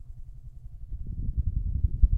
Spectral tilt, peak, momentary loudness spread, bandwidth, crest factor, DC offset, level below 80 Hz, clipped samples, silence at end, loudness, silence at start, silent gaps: -12 dB/octave; -6 dBFS; 18 LU; 0.7 kHz; 22 dB; under 0.1%; -28 dBFS; under 0.1%; 0 s; -32 LUFS; 0 s; none